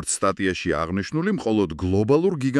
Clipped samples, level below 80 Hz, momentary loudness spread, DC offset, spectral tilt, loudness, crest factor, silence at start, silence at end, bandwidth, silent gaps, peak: under 0.1%; -50 dBFS; 5 LU; under 0.1%; -5.5 dB/octave; -22 LUFS; 16 dB; 0 s; 0 s; 12 kHz; none; -6 dBFS